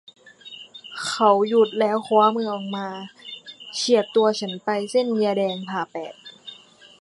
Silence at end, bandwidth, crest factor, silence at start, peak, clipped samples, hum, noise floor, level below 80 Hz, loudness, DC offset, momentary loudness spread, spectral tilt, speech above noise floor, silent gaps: 0.45 s; 11.5 kHz; 18 dB; 0.45 s; -4 dBFS; under 0.1%; none; -47 dBFS; -76 dBFS; -22 LUFS; under 0.1%; 20 LU; -4.5 dB/octave; 26 dB; none